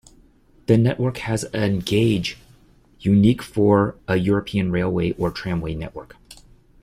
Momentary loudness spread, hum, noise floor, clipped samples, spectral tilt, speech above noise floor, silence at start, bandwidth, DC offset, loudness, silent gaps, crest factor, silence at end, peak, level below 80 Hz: 12 LU; none; -53 dBFS; under 0.1%; -7 dB/octave; 34 dB; 0.7 s; 14.5 kHz; under 0.1%; -21 LUFS; none; 18 dB; 0.5 s; -4 dBFS; -44 dBFS